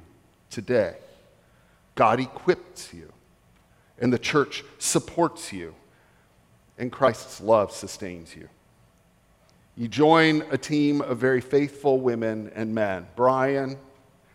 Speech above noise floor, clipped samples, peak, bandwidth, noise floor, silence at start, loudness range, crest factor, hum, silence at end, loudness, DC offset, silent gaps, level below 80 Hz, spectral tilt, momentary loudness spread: 37 dB; under 0.1%; -4 dBFS; 16 kHz; -61 dBFS; 0.5 s; 6 LU; 22 dB; none; 0.55 s; -24 LUFS; under 0.1%; none; -62 dBFS; -5 dB/octave; 16 LU